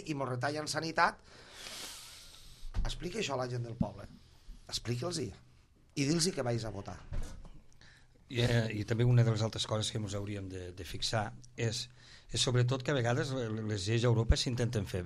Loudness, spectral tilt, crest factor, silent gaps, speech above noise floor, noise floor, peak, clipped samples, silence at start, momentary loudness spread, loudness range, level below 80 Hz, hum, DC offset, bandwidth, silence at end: -34 LUFS; -5 dB/octave; 22 dB; none; 26 dB; -59 dBFS; -12 dBFS; under 0.1%; 0 s; 16 LU; 6 LU; -46 dBFS; none; under 0.1%; 13 kHz; 0 s